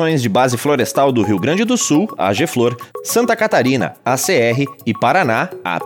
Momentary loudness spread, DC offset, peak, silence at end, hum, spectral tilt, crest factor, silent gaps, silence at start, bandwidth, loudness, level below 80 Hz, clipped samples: 5 LU; under 0.1%; -2 dBFS; 0 s; none; -4.5 dB/octave; 14 dB; none; 0 s; 19 kHz; -15 LUFS; -66 dBFS; under 0.1%